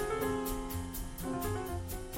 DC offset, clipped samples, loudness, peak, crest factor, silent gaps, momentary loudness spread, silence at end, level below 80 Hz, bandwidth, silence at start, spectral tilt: under 0.1%; under 0.1%; -37 LUFS; -22 dBFS; 14 dB; none; 6 LU; 0 s; -44 dBFS; 16.5 kHz; 0 s; -5 dB/octave